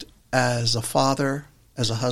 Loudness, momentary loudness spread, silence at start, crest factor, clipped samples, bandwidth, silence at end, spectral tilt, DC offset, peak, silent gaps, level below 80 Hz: -23 LUFS; 8 LU; 0 s; 20 dB; under 0.1%; 15.5 kHz; 0 s; -4.5 dB/octave; under 0.1%; -4 dBFS; none; -52 dBFS